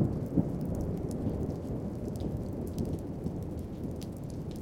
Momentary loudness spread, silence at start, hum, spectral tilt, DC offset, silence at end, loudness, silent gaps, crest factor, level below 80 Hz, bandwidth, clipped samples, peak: 8 LU; 0 s; none; -9 dB/octave; under 0.1%; 0 s; -36 LUFS; none; 20 dB; -46 dBFS; 17 kHz; under 0.1%; -14 dBFS